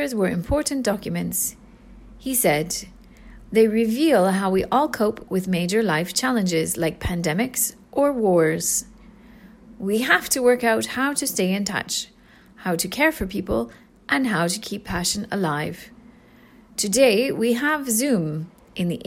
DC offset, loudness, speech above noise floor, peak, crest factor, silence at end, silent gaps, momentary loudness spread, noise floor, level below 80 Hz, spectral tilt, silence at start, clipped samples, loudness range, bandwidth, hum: under 0.1%; -22 LUFS; 29 dB; -4 dBFS; 18 dB; 0.05 s; none; 10 LU; -50 dBFS; -46 dBFS; -4 dB/octave; 0 s; under 0.1%; 4 LU; 16.5 kHz; none